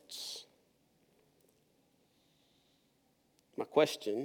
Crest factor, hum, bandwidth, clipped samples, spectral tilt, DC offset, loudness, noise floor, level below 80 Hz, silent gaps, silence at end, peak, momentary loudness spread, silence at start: 26 dB; none; 19 kHz; under 0.1%; -3.5 dB/octave; under 0.1%; -34 LUFS; -74 dBFS; under -90 dBFS; none; 0 s; -14 dBFS; 17 LU; 0.1 s